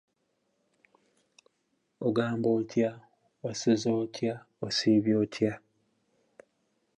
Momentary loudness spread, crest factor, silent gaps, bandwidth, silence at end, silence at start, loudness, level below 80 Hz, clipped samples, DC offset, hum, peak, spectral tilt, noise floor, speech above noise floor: 10 LU; 18 dB; none; 10.5 kHz; 1.4 s; 2 s; -29 LUFS; -72 dBFS; under 0.1%; under 0.1%; none; -12 dBFS; -5.5 dB/octave; -77 dBFS; 49 dB